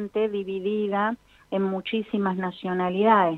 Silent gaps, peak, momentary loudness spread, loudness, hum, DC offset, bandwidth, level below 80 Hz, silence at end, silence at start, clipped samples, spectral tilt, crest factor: none; -6 dBFS; 8 LU; -26 LUFS; none; under 0.1%; 4.5 kHz; -64 dBFS; 0 s; 0 s; under 0.1%; -8.5 dB/octave; 20 dB